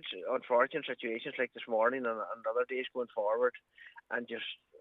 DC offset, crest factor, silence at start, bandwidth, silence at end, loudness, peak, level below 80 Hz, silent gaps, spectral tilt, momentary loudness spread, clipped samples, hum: under 0.1%; 20 dB; 0 s; 4.1 kHz; 0.25 s; -34 LUFS; -14 dBFS; -88 dBFS; none; -6 dB/octave; 10 LU; under 0.1%; none